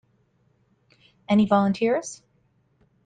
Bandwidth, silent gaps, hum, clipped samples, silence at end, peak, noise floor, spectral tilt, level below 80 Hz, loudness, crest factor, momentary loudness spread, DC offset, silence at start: 9.4 kHz; none; none; under 0.1%; 0.9 s; -8 dBFS; -66 dBFS; -6.5 dB/octave; -62 dBFS; -22 LUFS; 18 dB; 18 LU; under 0.1%; 1.3 s